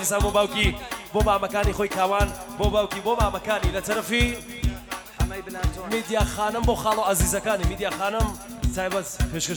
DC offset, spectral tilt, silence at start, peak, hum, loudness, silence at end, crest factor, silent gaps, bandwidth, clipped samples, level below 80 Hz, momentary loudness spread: under 0.1%; -4 dB/octave; 0 s; -6 dBFS; none; -25 LUFS; 0 s; 18 dB; none; over 20 kHz; under 0.1%; -30 dBFS; 7 LU